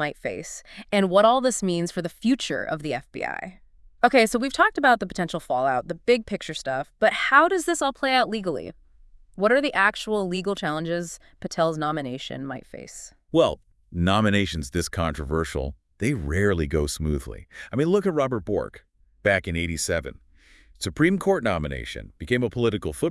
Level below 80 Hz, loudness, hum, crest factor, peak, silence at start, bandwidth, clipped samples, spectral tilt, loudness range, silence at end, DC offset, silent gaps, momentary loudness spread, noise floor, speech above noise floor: -44 dBFS; -24 LUFS; none; 22 dB; -2 dBFS; 0 s; 12 kHz; under 0.1%; -5 dB/octave; 4 LU; 0 s; under 0.1%; none; 16 LU; -54 dBFS; 30 dB